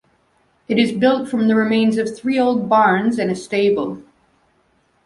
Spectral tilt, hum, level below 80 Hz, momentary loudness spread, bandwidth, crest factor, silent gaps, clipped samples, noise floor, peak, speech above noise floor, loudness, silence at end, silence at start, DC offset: -6 dB/octave; none; -60 dBFS; 7 LU; 11.5 kHz; 16 dB; none; under 0.1%; -61 dBFS; -2 dBFS; 44 dB; -17 LUFS; 1.05 s; 0.7 s; under 0.1%